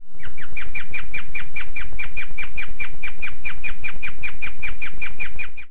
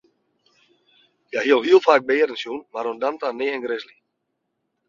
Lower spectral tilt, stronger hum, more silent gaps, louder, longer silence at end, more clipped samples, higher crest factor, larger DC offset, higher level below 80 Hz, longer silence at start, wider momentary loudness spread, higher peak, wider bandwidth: first, -6.5 dB/octave vs -4 dB/octave; neither; neither; second, -31 LUFS vs -21 LUFS; second, 0 s vs 1.05 s; neither; second, 14 dB vs 22 dB; first, 40% vs under 0.1%; first, -36 dBFS vs -70 dBFS; second, 0 s vs 1.35 s; second, 2 LU vs 15 LU; second, -6 dBFS vs -2 dBFS; second, 4.5 kHz vs 7.4 kHz